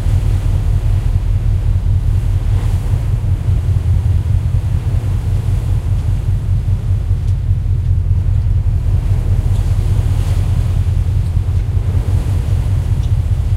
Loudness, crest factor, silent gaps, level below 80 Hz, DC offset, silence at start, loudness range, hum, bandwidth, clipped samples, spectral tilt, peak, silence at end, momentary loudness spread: -16 LUFS; 12 dB; none; -18 dBFS; under 0.1%; 0 s; 1 LU; none; 12 kHz; under 0.1%; -8 dB/octave; -2 dBFS; 0 s; 2 LU